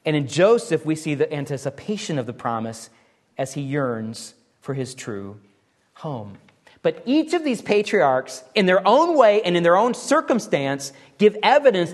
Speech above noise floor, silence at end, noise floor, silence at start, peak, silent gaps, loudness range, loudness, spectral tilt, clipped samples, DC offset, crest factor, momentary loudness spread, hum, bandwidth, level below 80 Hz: 37 dB; 0 s; -57 dBFS; 0.05 s; -2 dBFS; none; 12 LU; -20 LUFS; -5 dB/octave; under 0.1%; under 0.1%; 20 dB; 17 LU; none; 12.5 kHz; -68 dBFS